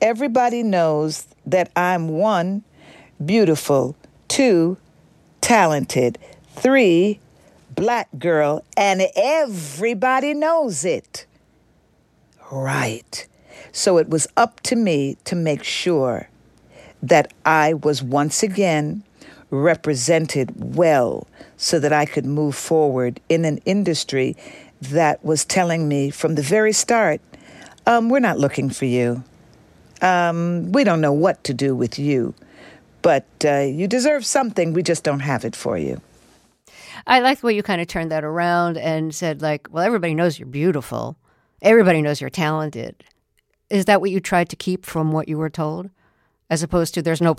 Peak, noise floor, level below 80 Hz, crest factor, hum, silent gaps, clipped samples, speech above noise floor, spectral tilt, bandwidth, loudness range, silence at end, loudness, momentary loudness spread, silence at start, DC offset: -2 dBFS; -67 dBFS; -56 dBFS; 18 dB; none; none; under 0.1%; 49 dB; -5 dB/octave; 15.5 kHz; 3 LU; 0.05 s; -19 LUFS; 10 LU; 0 s; under 0.1%